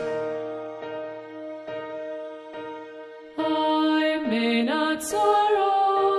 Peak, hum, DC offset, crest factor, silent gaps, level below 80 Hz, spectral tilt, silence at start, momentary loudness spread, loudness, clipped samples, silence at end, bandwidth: -10 dBFS; none; under 0.1%; 14 dB; none; -68 dBFS; -3.5 dB/octave; 0 s; 16 LU; -24 LUFS; under 0.1%; 0 s; 13 kHz